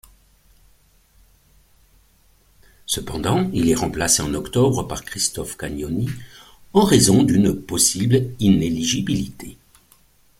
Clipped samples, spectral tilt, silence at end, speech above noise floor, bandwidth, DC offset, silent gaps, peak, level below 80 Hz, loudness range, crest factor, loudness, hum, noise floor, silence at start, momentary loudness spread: under 0.1%; -4.5 dB/octave; 0.85 s; 37 dB; 16.5 kHz; under 0.1%; none; 0 dBFS; -42 dBFS; 8 LU; 20 dB; -19 LUFS; none; -56 dBFS; 2.9 s; 14 LU